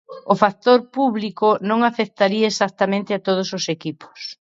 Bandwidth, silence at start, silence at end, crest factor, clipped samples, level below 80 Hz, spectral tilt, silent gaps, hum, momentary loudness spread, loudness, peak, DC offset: 7.8 kHz; 0.1 s; 0.15 s; 20 dB; under 0.1%; -68 dBFS; -5 dB/octave; none; none; 8 LU; -19 LUFS; 0 dBFS; under 0.1%